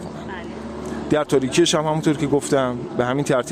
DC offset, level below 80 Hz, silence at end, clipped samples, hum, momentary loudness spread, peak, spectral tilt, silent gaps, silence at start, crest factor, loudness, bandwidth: under 0.1%; -48 dBFS; 0 s; under 0.1%; none; 14 LU; -6 dBFS; -5 dB/octave; none; 0 s; 16 dB; -20 LUFS; 16 kHz